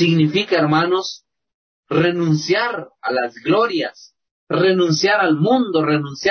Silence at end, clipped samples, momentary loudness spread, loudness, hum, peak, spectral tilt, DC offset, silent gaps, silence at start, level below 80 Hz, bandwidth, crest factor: 0 s; under 0.1%; 8 LU; -18 LUFS; none; -4 dBFS; -5.5 dB/octave; under 0.1%; 1.54-1.83 s, 4.31-4.47 s; 0 s; -62 dBFS; 6.6 kHz; 12 dB